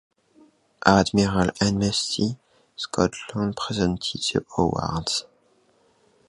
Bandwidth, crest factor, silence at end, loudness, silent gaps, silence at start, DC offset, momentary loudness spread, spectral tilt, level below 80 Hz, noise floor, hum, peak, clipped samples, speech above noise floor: 11.5 kHz; 24 dB; 1.05 s; -24 LUFS; none; 0.85 s; under 0.1%; 9 LU; -4.5 dB/octave; -46 dBFS; -62 dBFS; none; 0 dBFS; under 0.1%; 39 dB